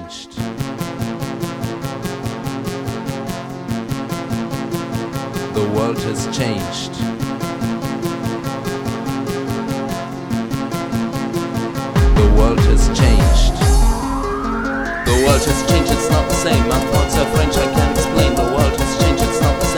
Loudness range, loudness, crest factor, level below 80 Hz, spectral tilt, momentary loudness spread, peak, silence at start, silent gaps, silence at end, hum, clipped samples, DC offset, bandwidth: 9 LU; -18 LUFS; 16 dB; -22 dBFS; -5.5 dB/octave; 11 LU; 0 dBFS; 0 s; none; 0 s; none; under 0.1%; under 0.1%; over 20 kHz